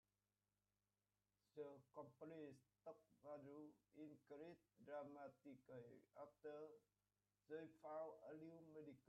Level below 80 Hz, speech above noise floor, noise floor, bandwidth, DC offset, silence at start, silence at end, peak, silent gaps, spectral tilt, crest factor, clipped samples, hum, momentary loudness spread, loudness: under -90 dBFS; over 30 dB; under -90 dBFS; 5.8 kHz; under 0.1%; 1.55 s; 0.05 s; -44 dBFS; none; -6.5 dB/octave; 18 dB; under 0.1%; 50 Hz at -90 dBFS; 8 LU; -61 LUFS